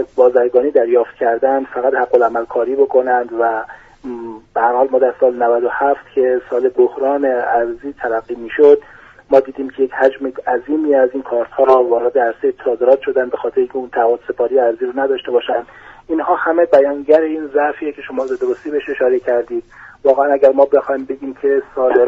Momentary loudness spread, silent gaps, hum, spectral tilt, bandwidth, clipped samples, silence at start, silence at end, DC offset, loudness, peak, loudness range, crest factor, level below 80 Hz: 10 LU; none; none; -6.5 dB/octave; 5.4 kHz; under 0.1%; 0 s; 0 s; under 0.1%; -15 LUFS; 0 dBFS; 2 LU; 14 dB; -54 dBFS